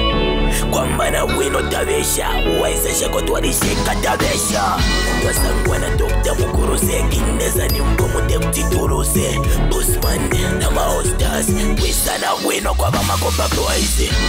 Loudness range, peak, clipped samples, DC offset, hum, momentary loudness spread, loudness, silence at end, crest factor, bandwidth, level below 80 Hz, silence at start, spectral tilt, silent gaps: 1 LU; -6 dBFS; under 0.1%; under 0.1%; none; 2 LU; -17 LUFS; 0 s; 10 dB; 16.5 kHz; -20 dBFS; 0 s; -4 dB/octave; none